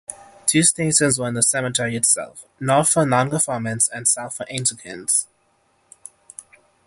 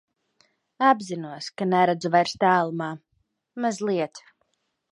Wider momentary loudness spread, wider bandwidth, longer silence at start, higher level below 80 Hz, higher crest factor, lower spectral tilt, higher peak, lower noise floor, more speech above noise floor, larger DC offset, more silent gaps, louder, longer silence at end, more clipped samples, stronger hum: about the same, 12 LU vs 13 LU; about the same, 12 kHz vs 11 kHz; second, 0.1 s vs 0.8 s; first, -58 dBFS vs -72 dBFS; about the same, 20 dB vs 20 dB; second, -3 dB/octave vs -5.5 dB/octave; first, -2 dBFS vs -6 dBFS; second, -63 dBFS vs -73 dBFS; second, 43 dB vs 50 dB; neither; neither; first, -19 LUFS vs -24 LUFS; first, 1.65 s vs 0.75 s; neither; neither